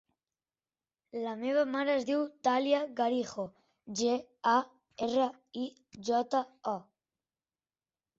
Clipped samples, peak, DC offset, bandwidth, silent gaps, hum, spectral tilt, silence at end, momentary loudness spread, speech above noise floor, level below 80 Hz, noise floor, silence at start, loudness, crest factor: under 0.1%; -14 dBFS; under 0.1%; 7.8 kHz; none; none; -4 dB/octave; 1.35 s; 12 LU; over 58 dB; -78 dBFS; under -90 dBFS; 1.15 s; -32 LUFS; 20 dB